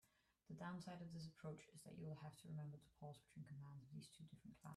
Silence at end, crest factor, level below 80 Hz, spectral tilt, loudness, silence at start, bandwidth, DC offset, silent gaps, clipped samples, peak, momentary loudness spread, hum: 0 s; 16 dB; -82 dBFS; -6.5 dB/octave; -58 LUFS; 0.05 s; 13 kHz; under 0.1%; none; under 0.1%; -42 dBFS; 8 LU; none